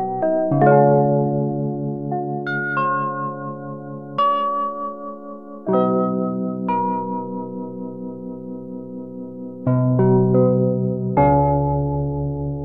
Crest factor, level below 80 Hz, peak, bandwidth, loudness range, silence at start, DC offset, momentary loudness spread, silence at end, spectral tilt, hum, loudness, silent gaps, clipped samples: 18 dB; -42 dBFS; -2 dBFS; 4.5 kHz; 7 LU; 0 s; under 0.1%; 17 LU; 0 s; -11.5 dB/octave; none; -20 LUFS; none; under 0.1%